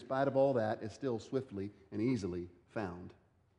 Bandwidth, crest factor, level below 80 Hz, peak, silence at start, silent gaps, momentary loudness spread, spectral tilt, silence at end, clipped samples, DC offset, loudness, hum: 10.5 kHz; 18 dB; -70 dBFS; -20 dBFS; 0 s; none; 14 LU; -7.5 dB/octave; 0.45 s; under 0.1%; under 0.1%; -37 LUFS; none